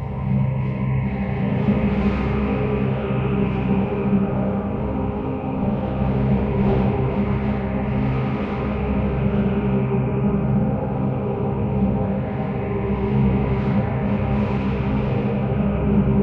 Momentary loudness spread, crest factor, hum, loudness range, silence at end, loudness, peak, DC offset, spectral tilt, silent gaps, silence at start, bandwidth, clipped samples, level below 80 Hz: 4 LU; 14 dB; none; 1 LU; 0 s; -22 LUFS; -6 dBFS; under 0.1%; -11 dB/octave; none; 0 s; 4.7 kHz; under 0.1%; -32 dBFS